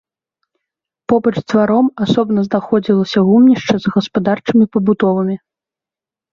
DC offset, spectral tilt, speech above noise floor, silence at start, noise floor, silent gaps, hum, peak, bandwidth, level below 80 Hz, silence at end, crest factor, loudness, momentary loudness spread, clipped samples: under 0.1%; -7.5 dB/octave; 75 dB; 1.1 s; -88 dBFS; none; none; -2 dBFS; 7.2 kHz; -54 dBFS; 0.95 s; 14 dB; -14 LUFS; 7 LU; under 0.1%